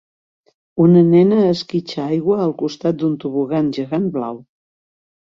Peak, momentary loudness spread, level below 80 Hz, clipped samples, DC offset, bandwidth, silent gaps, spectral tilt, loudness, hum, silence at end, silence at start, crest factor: -2 dBFS; 12 LU; -58 dBFS; under 0.1%; under 0.1%; 7.2 kHz; none; -8.5 dB/octave; -17 LUFS; none; 0.8 s; 0.75 s; 16 dB